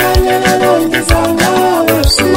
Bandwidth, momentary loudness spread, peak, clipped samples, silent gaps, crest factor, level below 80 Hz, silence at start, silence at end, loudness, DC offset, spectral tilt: 16.5 kHz; 2 LU; 0 dBFS; under 0.1%; none; 10 dB; -20 dBFS; 0 s; 0 s; -10 LUFS; under 0.1%; -4.5 dB/octave